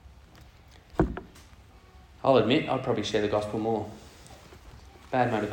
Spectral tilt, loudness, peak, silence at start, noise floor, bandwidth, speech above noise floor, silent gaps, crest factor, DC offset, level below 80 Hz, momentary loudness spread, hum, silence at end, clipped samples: -6 dB/octave; -27 LUFS; -8 dBFS; 0.05 s; -53 dBFS; 17.5 kHz; 27 dB; none; 22 dB; under 0.1%; -48 dBFS; 25 LU; none; 0 s; under 0.1%